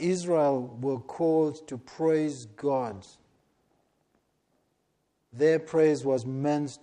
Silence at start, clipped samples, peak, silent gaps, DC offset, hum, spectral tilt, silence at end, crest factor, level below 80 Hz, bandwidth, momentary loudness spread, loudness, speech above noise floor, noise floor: 0 s; under 0.1%; -12 dBFS; none; under 0.1%; none; -6.5 dB/octave; 0.05 s; 16 dB; -72 dBFS; 10 kHz; 9 LU; -27 LUFS; 48 dB; -75 dBFS